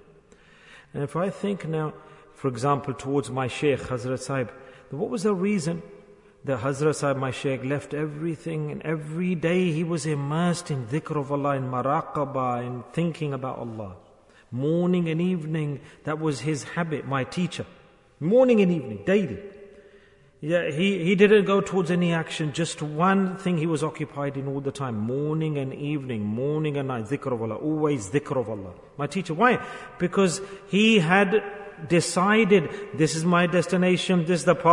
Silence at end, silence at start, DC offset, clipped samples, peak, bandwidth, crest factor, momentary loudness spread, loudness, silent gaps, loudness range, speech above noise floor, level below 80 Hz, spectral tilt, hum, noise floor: 0 s; 0.7 s; under 0.1%; under 0.1%; -4 dBFS; 11 kHz; 20 dB; 12 LU; -25 LUFS; none; 6 LU; 30 dB; -62 dBFS; -6 dB/octave; none; -54 dBFS